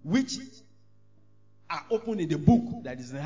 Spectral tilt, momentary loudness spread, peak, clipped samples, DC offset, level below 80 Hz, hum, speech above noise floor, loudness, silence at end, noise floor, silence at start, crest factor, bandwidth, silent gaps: -6.5 dB/octave; 15 LU; -6 dBFS; under 0.1%; 0.2%; -50 dBFS; none; 37 dB; -28 LUFS; 0 s; -63 dBFS; 0.05 s; 24 dB; 7.6 kHz; none